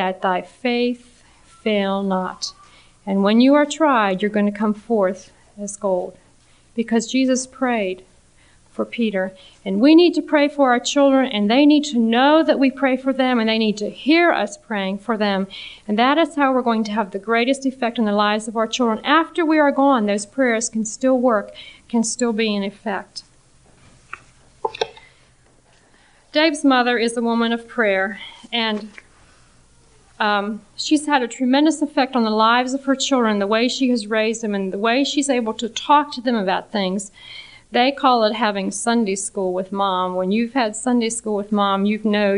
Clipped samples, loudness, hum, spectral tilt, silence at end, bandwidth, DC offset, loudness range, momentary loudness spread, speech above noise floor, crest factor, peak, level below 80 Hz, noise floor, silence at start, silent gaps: under 0.1%; -19 LUFS; none; -4 dB/octave; 0 s; 10.5 kHz; under 0.1%; 7 LU; 12 LU; 35 dB; 18 dB; -2 dBFS; -58 dBFS; -54 dBFS; 0 s; none